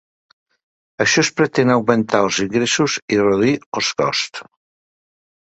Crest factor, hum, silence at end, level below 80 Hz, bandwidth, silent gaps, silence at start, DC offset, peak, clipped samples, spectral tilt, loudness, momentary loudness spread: 18 dB; none; 1.05 s; -56 dBFS; 8.2 kHz; 3.02-3.08 s, 3.66-3.72 s; 1 s; under 0.1%; 0 dBFS; under 0.1%; -4 dB/octave; -17 LUFS; 5 LU